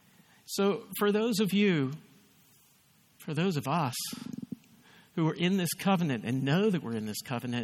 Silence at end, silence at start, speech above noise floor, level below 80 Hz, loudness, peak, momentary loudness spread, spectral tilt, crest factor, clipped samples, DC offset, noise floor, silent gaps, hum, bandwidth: 0 s; 0.5 s; 35 dB; -74 dBFS; -30 LUFS; -14 dBFS; 14 LU; -5.5 dB/octave; 18 dB; under 0.1%; under 0.1%; -64 dBFS; none; none; 18 kHz